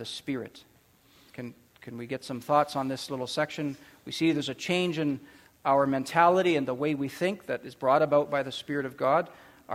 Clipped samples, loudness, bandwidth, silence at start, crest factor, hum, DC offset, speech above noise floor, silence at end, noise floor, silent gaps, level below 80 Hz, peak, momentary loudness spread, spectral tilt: under 0.1%; -28 LUFS; 16 kHz; 0 s; 22 dB; none; under 0.1%; 33 dB; 0 s; -61 dBFS; none; -70 dBFS; -8 dBFS; 18 LU; -5.5 dB/octave